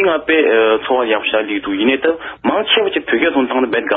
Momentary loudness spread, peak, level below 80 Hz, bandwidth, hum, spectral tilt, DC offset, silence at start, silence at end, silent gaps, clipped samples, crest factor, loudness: 6 LU; -2 dBFS; -52 dBFS; 4 kHz; none; -0.5 dB/octave; under 0.1%; 0 s; 0 s; none; under 0.1%; 14 dB; -15 LUFS